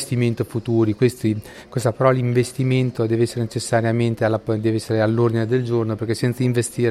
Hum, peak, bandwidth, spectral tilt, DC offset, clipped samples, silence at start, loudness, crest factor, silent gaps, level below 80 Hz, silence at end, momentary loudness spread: none; -2 dBFS; 13.5 kHz; -6.5 dB/octave; under 0.1%; under 0.1%; 0 s; -20 LUFS; 18 dB; none; -54 dBFS; 0 s; 6 LU